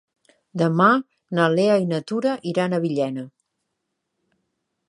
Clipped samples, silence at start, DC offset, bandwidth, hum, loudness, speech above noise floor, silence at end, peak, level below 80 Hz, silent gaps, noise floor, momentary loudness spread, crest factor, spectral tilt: under 0.1%; 0.55 s; under 0.1%; 11 kHz; none; -21 LUFS; 58 dB; 1.6 s; -2 dBFS; -74 dBFS; none; -78 dBFS; 11 LU; 20 dB; -7 dB/octave